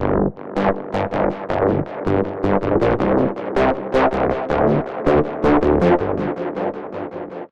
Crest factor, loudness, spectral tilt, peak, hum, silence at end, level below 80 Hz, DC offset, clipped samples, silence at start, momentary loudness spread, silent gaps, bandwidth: 16 dB; -19 LUFS; -8.5 dB/octave; -4 dBFS; none; 0.05 s; -36 dBFS; under 0.1%; under 0.1%; 0 s; 8 LU; none; 8.2 kHz